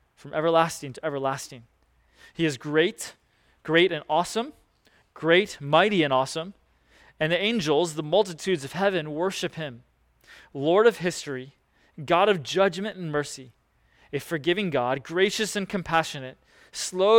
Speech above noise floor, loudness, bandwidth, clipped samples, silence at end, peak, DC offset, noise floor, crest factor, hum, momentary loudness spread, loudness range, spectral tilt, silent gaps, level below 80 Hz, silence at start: 38 dB; -25 LUFS; 17.5 kHz; under 0.1%; 0 s; -6 dBFS; under 0.1%; -63 dBFS; 20 dB; none; 16 LU; 3 LU; -4.5 dB/octave; none; -62 dBFS; 0.25 s